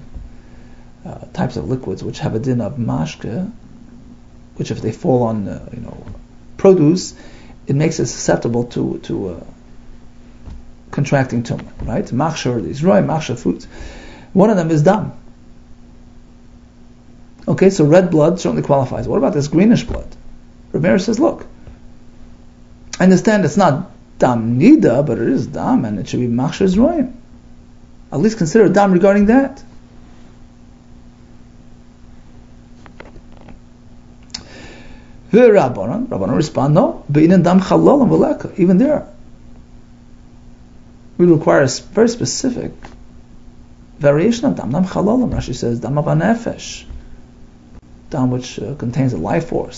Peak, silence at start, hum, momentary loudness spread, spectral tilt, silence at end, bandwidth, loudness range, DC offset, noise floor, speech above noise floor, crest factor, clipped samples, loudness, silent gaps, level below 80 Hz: 0 dBFS; 0 s; 60 Hz at -40 dBFS; 18 LU; -7 dB/octave; 0 s; 8 kHz; 9 LU; under 0.1%; -42 dBFS; 27 dB; 16 dB; under 0.1%; -15 LUFS; none; -38 dBFS